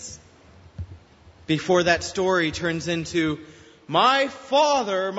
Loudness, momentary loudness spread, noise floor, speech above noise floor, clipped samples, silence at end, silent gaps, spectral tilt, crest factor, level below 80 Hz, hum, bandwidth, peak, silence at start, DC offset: -22 LUFS; 20 LU; -51 dBFS; 29 dB; under 0.1%; 0 s; none; -4 dB/octave; 20 dB; -52 dBFS; none; 8 kHz; -4 dBFS; 0 s; under 0.1%